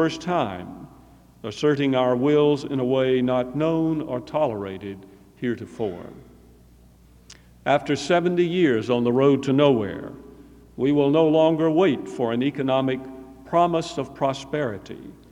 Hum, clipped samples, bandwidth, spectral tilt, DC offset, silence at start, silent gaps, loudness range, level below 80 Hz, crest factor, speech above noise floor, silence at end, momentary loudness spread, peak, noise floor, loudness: none; under 0.1%; 11 kHz; -6.5 dB/octave; under 0.1%; 0 s; none; 8 LU; -56 dBFS; 20 dB; 30 dB; 0.2 s; 17 LU; -4 dBFS; -52 dBFS; -22 LUFS